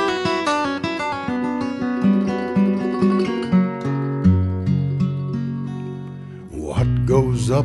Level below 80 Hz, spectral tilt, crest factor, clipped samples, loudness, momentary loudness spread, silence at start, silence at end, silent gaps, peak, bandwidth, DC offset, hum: -40 dBFS; -7 dB/octave; 16 dB; under 0.1%; -20 LUFS; 10 LU; 0 s; 0 s; none; -4 dBFS; 11.5 kHz; under 0.1%; none